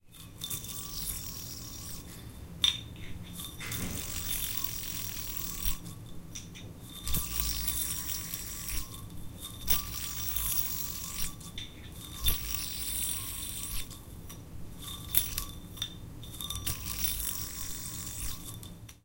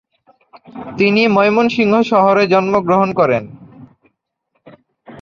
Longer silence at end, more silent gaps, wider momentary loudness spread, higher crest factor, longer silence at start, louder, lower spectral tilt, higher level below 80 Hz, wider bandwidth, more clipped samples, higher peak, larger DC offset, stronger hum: about the same, 0.05 s vs 0 s; neither; first, 16 LU vs 10 LU; first, 32 dB vs 14 dB; second, 0.05 s vs 0.75 s; second, -33 LUFS vs -13 LUFS; second, -2 dB/octave vs -6.5 dB/octave; first, -44 dBFS vs -56 dBFS; first, 17 kHz vs 7.2 kHz; neither; about the same, -4 dBFS vs -2 dBFS; neither; neither